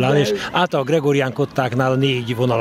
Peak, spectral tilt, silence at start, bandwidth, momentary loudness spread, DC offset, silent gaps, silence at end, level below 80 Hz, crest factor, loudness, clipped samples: -4 dBFS; -6 dB/octave; 0 s; 15.5 kHz; 3 LU; under 0.1%; none; 0 s; -54 dBFS; 14 dB; -19 LUFS; under 0.1%